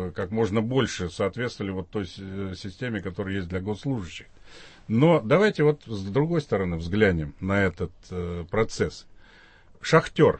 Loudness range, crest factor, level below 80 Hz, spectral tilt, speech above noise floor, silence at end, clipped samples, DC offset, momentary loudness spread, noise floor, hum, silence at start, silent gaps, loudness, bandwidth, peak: 8 LU; 20 dB; -48 dBFS; -6.5 dB/octave; 27 dB; 0 s; under 0.1%; under 0.1%; 14 LU; -52 dBFS; none; 0 s; none; -26 LUFS; 8.8 kHz; -6 dBFS